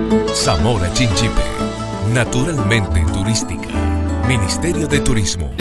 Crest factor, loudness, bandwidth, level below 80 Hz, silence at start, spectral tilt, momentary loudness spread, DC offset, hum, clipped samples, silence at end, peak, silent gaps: 14 dB; -17 LUFS; 12.5 kHz; -24 dBFS; 0 s; -5 dB/octave; 5 LU; under 0.1%; none; under 0.1%; 0 s; -2 dBFS; none